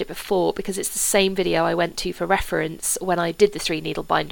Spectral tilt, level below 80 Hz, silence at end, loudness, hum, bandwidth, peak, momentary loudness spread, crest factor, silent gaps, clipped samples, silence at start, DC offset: -3 dB/octave; -42 dBFS; 0 s; -22 LUFS; none; 19 kHz; -4 dBFS; 6 LU; 18 dB; none; under 0.1%; 0 s; under 0.1%